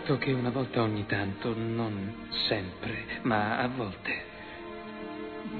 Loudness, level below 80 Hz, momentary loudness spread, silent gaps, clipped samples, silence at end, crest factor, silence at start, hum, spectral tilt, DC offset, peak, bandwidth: -32 LUFS; -56 dBFS; 12 LU; none; under 0.1%; 0 s; 20 dB; 0 s; none; -8.5 dB/octave; under 0.1%; -12 dBFS; 4.6 kHz